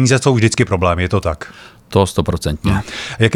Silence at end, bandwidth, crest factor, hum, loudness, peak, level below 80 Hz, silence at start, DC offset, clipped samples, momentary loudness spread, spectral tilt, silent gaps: 0 s; 14 kHz; 14 dB; none; -16 LUFS; 0 dBFS; -34 dBFS; 0 s; under 0.1%; under 0.1%; 10 LU; -5.5 dB/octave; none